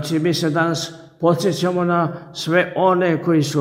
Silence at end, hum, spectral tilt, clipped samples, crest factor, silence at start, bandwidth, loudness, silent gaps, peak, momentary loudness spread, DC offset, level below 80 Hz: 0 s; none; -5.5 dB/octave; under 0.1%; 14 dB; 0 s; 16 kHz; -19 LUFS; none; -4 dBFS; 7 LU; under 0.1%; -62 dBFS